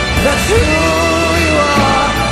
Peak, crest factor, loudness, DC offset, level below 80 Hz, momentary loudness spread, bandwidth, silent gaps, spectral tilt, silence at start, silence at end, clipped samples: 0 dBFS; 10 dB; -11 LUFS; under 0.1%; -22 dBFS; 2 LU; 16 kHz; none; -4 dB/octave; 0 s; 0 s; under 0.1%